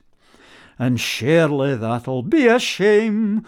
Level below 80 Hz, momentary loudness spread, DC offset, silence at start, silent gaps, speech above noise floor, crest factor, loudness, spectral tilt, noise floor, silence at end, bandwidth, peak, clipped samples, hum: -58 dBFS; 8 LU; under 0.1%; 0.8 s; none; 34 dB; 16 dB; -18 LUFS; -5.5 dB/octave; -51 dBFS; 0.05 s; 17.5 kHz; -4 dBFS; under 0.1%; none